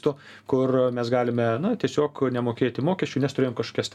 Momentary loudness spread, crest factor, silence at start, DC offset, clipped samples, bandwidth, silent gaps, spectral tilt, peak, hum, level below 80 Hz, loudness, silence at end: 4 LU; 16 dB; 0.05 s; under 0.1%; under 0.1%; 11.5 kHz; none; -6.5 dB/octave; -10 dBFS; none; -66 dBFS; -25 LUFS; 0.05 s